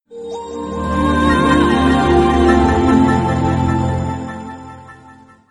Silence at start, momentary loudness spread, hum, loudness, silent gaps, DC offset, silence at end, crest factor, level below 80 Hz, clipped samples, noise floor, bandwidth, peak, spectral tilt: 0.1 s; 16 LU; none; -14 LUFS; none; under 0.1%; 0.4 s; 14 dB; -28 dBFS; under 0.1%; -43 dBFS; 11.5 kHz; 0 dBFS; -7 dB/octave